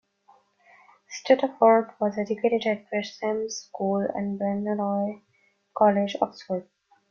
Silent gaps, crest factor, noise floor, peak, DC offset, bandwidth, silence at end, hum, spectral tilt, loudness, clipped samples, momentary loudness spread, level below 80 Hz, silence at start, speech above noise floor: none; 20 dB; -61 dBFS; -6 dBFS; under 0.1%; 7 kHz; 0.5 s; none; -5.5 dB/octave; -25 LUFS; under 0.1%; 14 LU; -72 dBFS; 1.1 s; 36 dB